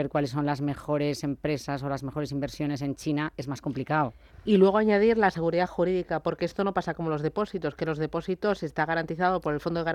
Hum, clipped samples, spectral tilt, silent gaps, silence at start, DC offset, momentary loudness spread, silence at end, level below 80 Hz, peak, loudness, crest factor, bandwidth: none; under 0.1%; -7 dB/octave; none; 0 s; under 0.1%; 10 LU; 0 s; -54 dBFS; -10 dBFS; -28 LUFS; 18 dB; 14.5 kHz